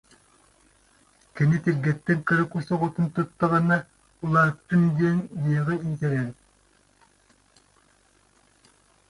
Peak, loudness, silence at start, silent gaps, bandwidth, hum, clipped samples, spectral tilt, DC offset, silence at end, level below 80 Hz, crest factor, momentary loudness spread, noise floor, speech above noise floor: -8 dBFS; -24 LUFS; 1.35 s; none; 11 kHz; none; under 0.1%; -8.5 dB/octave; under 0.1%; 2.75 s; -58 dBFS; 18 dB; 6 LU; -62 dBFS; 39 dB